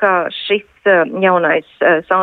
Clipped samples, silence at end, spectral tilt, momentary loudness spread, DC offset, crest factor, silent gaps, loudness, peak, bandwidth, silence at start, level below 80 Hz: under 0.1%; 0 s; -7.5 dB/octave; 5 LU; under 0.1%; 12 dB; none; -14 LUFS; -2 dBFS; 4.5 kHz; 0 s; -60 dBFS